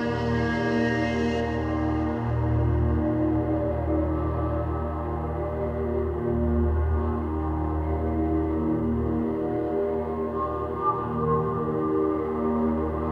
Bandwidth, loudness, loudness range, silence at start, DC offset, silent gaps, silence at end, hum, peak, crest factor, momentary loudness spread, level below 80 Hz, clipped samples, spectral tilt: 6.8 kHz; -26 LUFS; 2 LU; 0 s; under 0.1%; none; 0 s; none; -12 dBFS; 12 dB; 4 LU; -34 dBFS; under 0.1%; -9 dB/octave